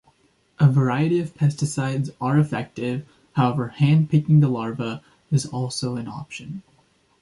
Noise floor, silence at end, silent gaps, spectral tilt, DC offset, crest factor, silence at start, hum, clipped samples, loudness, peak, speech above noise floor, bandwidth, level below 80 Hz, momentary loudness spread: -61 dBFS; 0.6 s; none; -7 dB/octave; under 0.1%; 18 dB; 0.6 s; none; under 0.1%; -22 LUFS; -4 dBFS; 40 dB; 11.5 kHz; -58 dBFS; 15 LU